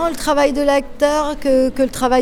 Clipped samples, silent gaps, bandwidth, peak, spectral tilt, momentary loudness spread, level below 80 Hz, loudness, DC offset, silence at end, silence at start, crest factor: under 0.1%; none; 18 kHz; -2 dBFS; -4 dB/octave; 3 LU; -34 dBFS; -16 LUFS; under 0.1%; 0 s; 0 s; 14 dB